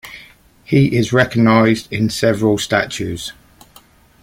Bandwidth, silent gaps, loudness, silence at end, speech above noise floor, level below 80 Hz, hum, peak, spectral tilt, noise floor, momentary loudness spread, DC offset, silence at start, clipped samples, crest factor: 16.5 kHz; none; -15 LUFS; 0.9 s; 33 dB; -46 dBFS; none; -2 dBFS; -6 dB/octave; -48 dBFS; 13 LU; under 0.1%; 0.05 s; under 0.1%; 16 dB